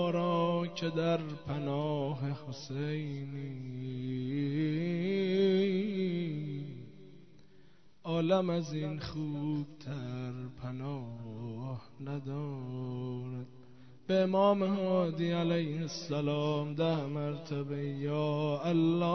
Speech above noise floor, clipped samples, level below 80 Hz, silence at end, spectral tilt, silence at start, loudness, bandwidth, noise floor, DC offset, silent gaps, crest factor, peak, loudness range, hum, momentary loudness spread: 30 dB; under 0.1%; -68 dBFS; 0 s; -7.5 dB/octave; 0 s; -34 LUFS; 6.4 kHz; -63 dBFS; 0.2%; none; 18 dB; -16 dBFS; 9 LU; none; 13 LU